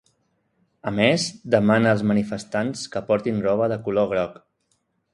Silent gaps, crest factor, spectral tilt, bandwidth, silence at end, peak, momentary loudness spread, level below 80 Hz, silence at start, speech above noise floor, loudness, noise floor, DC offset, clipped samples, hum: none; 22 dB; -5.5 dB/octave; 11.5 kHz; 0.8 s; -2 dBFS; 9 LU; -56 dBFS; 0.85 s; 49 dB; -22 LUFS; -70 dBFS; under 0.1%; under 0.1%; none